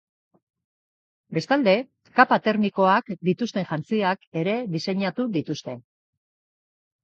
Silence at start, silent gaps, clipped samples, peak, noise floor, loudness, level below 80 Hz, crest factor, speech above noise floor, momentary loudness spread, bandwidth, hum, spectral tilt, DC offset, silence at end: 1.3 s; 4.27-4.32 s; under 0.1%; -2 dBFS; under -90 dBFS; -23 LUFS; -72 dBFS; 24 dB; over 67 dB; 11 LU; 7.6 kHz; none; -6.5 dB/octave; under 0.1%; 1.25 s